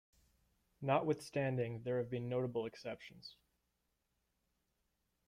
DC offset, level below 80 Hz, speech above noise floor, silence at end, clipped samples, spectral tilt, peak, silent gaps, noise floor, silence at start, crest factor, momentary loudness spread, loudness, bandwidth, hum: under 0.1%; -76 dBFS; 45 dB; 1.95 s; under 0.1%; -7 dB/octave; -20 dBFS; none; -84 dBFS; 0.8 s; 22 dB; 16 LU; -39 LUFS; 14.5 kHz; none